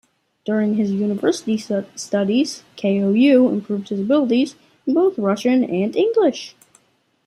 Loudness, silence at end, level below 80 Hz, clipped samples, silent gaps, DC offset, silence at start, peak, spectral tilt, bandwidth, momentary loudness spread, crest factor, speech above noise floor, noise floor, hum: -19 LUFS; 0.75 s; -68 dBFS; under 0.1%; none; under 0.1%; 0.45 s; -4 dBFS; -6 dB/octave; 12 kHz; 9 LU; 16 dB; 44 dB; -62 dBFS; none